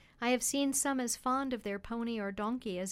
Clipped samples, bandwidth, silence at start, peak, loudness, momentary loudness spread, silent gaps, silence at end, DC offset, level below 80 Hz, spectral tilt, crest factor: under 0.1%; 16 kHz; 0.2 s; -20 dBFS; -34 LUFS; 7 LU; none; 0 s; under 0.1%; -62 dBFS; -3 dB/octave; 14 dB